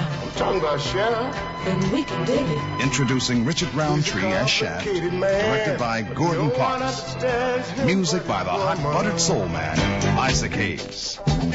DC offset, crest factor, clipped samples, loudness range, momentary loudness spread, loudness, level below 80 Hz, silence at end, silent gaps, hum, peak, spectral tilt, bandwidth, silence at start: under 0.1%; 16 dB; under 0.1%; 1 LU; 5 LU; -22 LUFS; -40 dBFS; 0 s; none; none; -6 dBFS; -4.5 dB/octave; 8 kHz; 0 s